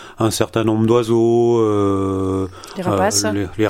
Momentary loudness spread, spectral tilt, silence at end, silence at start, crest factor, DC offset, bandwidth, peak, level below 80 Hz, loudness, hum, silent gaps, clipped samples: 7 LU; -5.5 dB/octave; 0 s; 0 s; 16 dB; under 0.1%; 16.5 kHz; 0 dBFS; -48 dBFS; -17 LUFS; none; none; under 0.1%